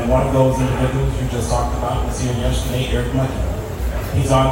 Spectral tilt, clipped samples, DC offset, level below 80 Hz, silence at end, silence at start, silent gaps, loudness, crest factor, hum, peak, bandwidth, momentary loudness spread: -6 dB/octave; under 0.1%; under 0.1%; -24 dBFS; 0 s; 0 s; none; -19 LUFS; 14 dB; none; -4 dBFS; 16.5 kHz; 8 LU